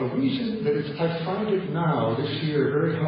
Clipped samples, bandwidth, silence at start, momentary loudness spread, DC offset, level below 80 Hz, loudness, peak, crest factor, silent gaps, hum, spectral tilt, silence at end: under 0.1%; 5.4 kHz; 0 s; 3 LU; under 0.1%; -60 dBFS; -25 LUFS; -12 dBFS; 12 dB; none; none; -11.5 dB/octave; 0 s